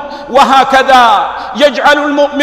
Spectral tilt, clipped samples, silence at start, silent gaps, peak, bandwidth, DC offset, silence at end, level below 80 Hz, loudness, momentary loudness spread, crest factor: -2.5 dB/octave; 2%; 0 s; none; 0 dBFS; 16 kHz; under 0.1%; 0 s; -42 dBFS; -8 LUFS; 6 LU; 8 dB